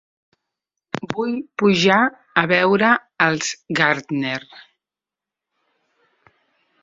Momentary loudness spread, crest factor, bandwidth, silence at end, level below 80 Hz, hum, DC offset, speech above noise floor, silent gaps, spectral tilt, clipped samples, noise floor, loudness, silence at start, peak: 11 LU; 20 dB; 7.8 kHz; 2.25 s; -62 dBFS; none; under 0.1%; 70 dB; none; -4.5 dB/octave; under 0.1%; -88 dBFS; -18 LUFS; 0.95 s; -2 dBFS